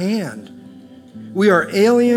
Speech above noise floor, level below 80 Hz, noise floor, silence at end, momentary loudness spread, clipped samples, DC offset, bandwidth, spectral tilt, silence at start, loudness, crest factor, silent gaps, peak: 25 dB; -68 dBFS; -40 dBFS; 0 s; 20 LU; under 0.1%; under 0.1%; 15.5 kHz; -6 dB/octave; 0 s; -16 LUFS; 16 dB; none; 0 dBFS